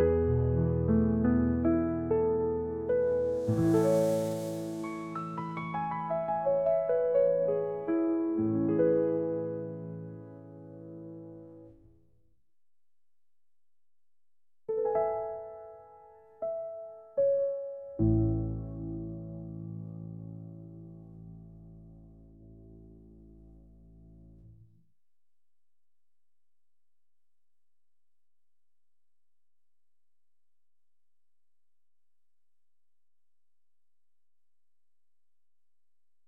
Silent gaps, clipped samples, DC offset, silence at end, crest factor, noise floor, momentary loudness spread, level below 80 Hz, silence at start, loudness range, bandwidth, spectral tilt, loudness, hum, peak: none; under 0.1%; under 0.1%; 11.75 s; 20 dB; under -90 dBFS; 21 LU; -52 dBFS; 0 s; 20 LU; 15.5 kHz; -9 dB/octave; -30 LUFS; none; -14 dBFS